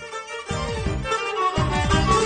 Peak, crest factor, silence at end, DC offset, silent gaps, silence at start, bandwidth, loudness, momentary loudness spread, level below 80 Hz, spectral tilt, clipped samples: -6 dBFS; 16 dB; 0 s; under 0.1%; none; 0 s; 9.4 kHz; -24 LUFS; 10 LU; -32 dBFS; -5 dB/octave; under 0.1%